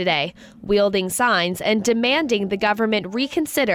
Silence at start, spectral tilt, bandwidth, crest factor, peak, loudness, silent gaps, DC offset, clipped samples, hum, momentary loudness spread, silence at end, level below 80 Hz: 0 s; -3.5 dB/octave; over 20 kHz; 14 dB; -8 dBFS; -20 LUFS; none; under 0.1%; under 0.1%; none; 4 LU; 0 s; -52 dBFS